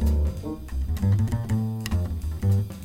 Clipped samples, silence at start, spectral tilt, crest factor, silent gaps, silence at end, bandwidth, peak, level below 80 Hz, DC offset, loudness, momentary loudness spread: under 0.1%; 0 s; -7.5 dB/octave; 12 dB; none; 0 s; 16 kHz; -12 dBFS; -30 dBFS; under 0.1%; -27 LUFS; 8 LU